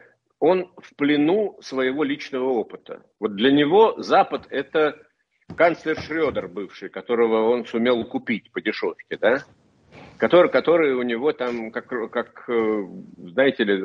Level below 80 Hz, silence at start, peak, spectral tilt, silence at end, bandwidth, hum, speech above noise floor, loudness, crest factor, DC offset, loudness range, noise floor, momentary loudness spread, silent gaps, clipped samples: -62 dBFS; 0.4 s; -4 dBFS; -6.5 dB/octave; 0 s; 7 kHz; none; 26 dB; -22 LUFS; 18 dB; under 0.1%; 3 LU; -48 dBFS; 13 LU; none; under 0.1%